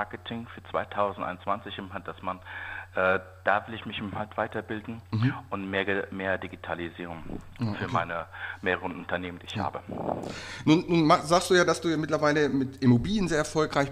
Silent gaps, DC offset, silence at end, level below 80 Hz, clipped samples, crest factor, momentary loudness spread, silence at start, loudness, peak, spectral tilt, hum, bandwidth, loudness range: none; under 0.1%; 0 s; -52 dBFS; under 0.1%; 22 dB; 15 LU; 0 s; -28 LUFS; -8 dBFS; -5.5 dB/octave; none; 15 kHz; 8 LU